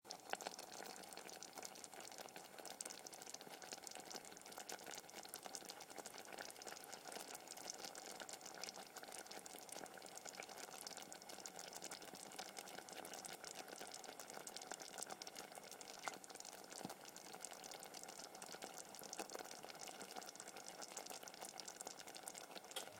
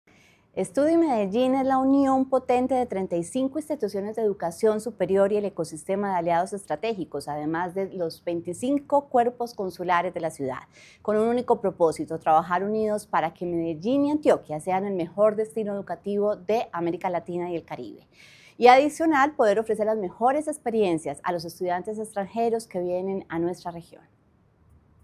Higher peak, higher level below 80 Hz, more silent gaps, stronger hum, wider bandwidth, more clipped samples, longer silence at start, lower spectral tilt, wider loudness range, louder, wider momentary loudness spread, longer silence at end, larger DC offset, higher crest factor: second, -22 dBFS vs -4 dBFS; second, under -90 dBFS vs -62 dBFS; neither; neither; first, 17 kHz vs 14.5 kHz; neither; second, 0.05 s vs 0.55 s; second, -1 dB/octave vs -6 dB/octave; second, 1 LU vs 5 LU; second, -53 LUFS vs -25 LUFS; second, 3 LU vs 10 LU; second, 0 s vs 1.2 s; neither; first, 32 dB vs 22 dB